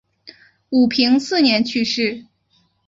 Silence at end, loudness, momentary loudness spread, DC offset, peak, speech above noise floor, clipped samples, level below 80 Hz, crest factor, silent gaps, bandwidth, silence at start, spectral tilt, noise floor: 0.65 s; -17 LUFS; 7 LU; under 0.1%; -2 dBFS; 46 dB; under 0.1%; -60 dBFS; 16 dB; none; 7.8 kHz; 0.25 s; -4 dB/octave; -62 dBFS